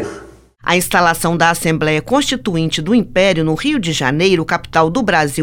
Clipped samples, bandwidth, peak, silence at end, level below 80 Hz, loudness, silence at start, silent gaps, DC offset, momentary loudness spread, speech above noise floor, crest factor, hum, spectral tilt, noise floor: under 0.1%; 18 kHz; 0 dBFS; 0 s; -40 dBFS; -15 LUFS; 0 s; none; under 0.1%; 4 LU; 23 dB; 14 dB; none; -4.5 dB/octave; -38 dBFS